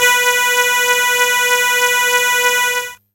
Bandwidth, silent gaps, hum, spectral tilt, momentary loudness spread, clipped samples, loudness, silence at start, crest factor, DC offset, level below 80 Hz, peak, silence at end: 17 kHz; none; none; 2 dB/octave; 2 LU; under 0.1%; -12 LUFS; 0 s; 14 dB; under 0.1%; -60 dBFS; 0 dBFS; 0.2 s